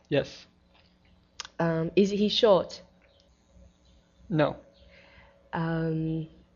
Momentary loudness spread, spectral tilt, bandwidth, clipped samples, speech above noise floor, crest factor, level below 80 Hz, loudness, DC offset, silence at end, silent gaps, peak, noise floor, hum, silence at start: 20 LU; -5 dB/octave; 7.4 kHz; under 0.1%; 36 dB; 20 dB; -58 dBFS; -27 LUFS; under 0.1%; 0.3 s; none; -10 dBFS; -62 dBFS; none; 0.1 s